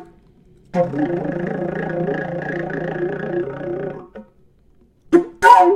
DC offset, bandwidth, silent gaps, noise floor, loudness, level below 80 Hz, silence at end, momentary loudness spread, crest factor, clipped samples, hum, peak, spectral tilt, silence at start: under 0.1%; 14.5 kHz; none; -54 dBFS; -20 LUFS; -52 dBFS; 0 s; 13 LU; 20 dB; under 0.1%; none; 0 dBFS; -6.5 dB/octave; 0 s